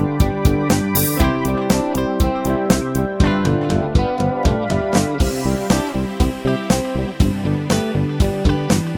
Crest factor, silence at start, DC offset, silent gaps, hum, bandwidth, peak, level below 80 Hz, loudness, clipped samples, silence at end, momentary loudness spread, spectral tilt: 18 dB; 0 s; under 0.1%; none; none; 19 kHz; 0 dBFS; -26 dBFS; -18 LUFS; under 0.1%; 0 s; 3 LU; -6 dB/octave